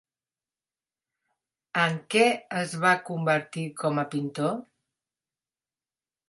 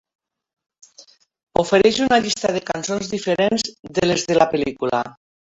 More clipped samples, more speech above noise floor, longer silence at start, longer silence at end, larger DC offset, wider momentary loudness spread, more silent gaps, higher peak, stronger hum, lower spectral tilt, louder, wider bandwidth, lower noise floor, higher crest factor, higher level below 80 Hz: neither; first, over 64 dB vs 31 dB; first, 1.75 s vs 1 s; first, 1.7 s vs 0.35 s; neither; about the same, 9 LU vs 9 LU; second, none vs 1.43-1.47 s, 3.79-3.83 s; second, -6 dBFS vs -2 dBFS; neither; about the same, -5 dB/octave vs -4 dB/octave; second, -26 LUFS vs -19 LUFS; first, 11.5 kHz vs 8.4 kHz; first, under -90 dBFS vs -50 dBFS; about the same, 22 dB vs 18 dB; second, -76 dBFS vs -52 dBFS